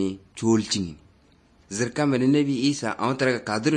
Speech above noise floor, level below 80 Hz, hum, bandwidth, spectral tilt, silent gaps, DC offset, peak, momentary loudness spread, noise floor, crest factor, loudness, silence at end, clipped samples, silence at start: 35 dB; -60 dBFS; none; 9.8 kHz; -5 dB/octave; none; under 0.1%; -8 dBFS; 8 LU; -58 dBFS; 16 dB; -24 LUFS; 0 s; under 0.1%; 0 s